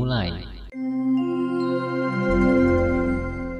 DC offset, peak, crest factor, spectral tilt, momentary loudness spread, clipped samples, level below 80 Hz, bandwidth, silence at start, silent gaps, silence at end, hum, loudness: under 0.1%; -8 dBFS; 14 dB; -8.5 dB/octave; 11 LU; under 0.1%; -36 dBFS; 6.6 kHz; 0 s; none; 0 s; none; -23 LUFS